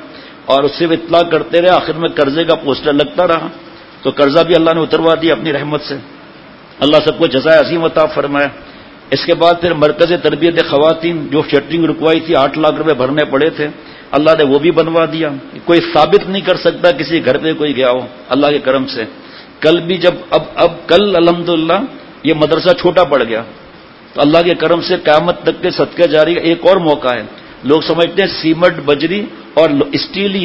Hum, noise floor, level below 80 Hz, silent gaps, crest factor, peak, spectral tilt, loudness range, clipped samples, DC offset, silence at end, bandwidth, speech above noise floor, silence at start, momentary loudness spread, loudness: none; -37 dBFS; -46 dBFS; none; 12 dB; 0 dBFS; -7 dB/octave; 2 LU; 0.3%; under 0.1%; 0 s; 8 kHz; 25 dB; 0 s; 8 LU; -12 LUFS